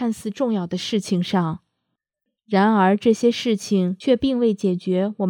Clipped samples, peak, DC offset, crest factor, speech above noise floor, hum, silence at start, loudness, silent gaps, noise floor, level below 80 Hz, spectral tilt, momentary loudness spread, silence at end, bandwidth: under 0.1%; -4 dBFS; under 0.1%; 16 dB; 61 dB; none; 0 s; -21 LUFS; none; -81 dBFS; -56 dBFS; -6 dB/octave; 7 LU; 0 s; 14 kHz